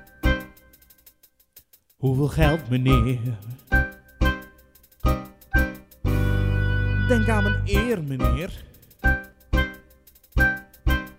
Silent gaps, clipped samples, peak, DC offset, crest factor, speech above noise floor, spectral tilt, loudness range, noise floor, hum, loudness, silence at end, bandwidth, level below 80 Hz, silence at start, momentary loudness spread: none; under 0.1%; -4 dBFS; under 0.1%; 20 dB; 35 dB; -6.5 dB/octave; 3 LU; -56 dBFS; none; -24 LUFS; 0.05 s; 16 kHz; -28 dBFS; 0.25 s; 10 LU